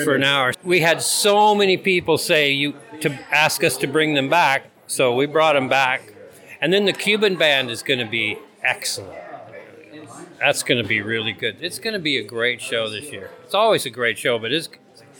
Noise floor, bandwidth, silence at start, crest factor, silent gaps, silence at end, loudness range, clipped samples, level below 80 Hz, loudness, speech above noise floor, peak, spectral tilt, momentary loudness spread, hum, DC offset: -42 dBFS; over 20 kHz; 0 s; 18 dB; none; 0.5 s; 6 LU; under 0.1%; -68 dBFS; -19 LUFS; 23 dB; -2 dBFS; -3 dB/octave; 10 LU; none; under 0.1%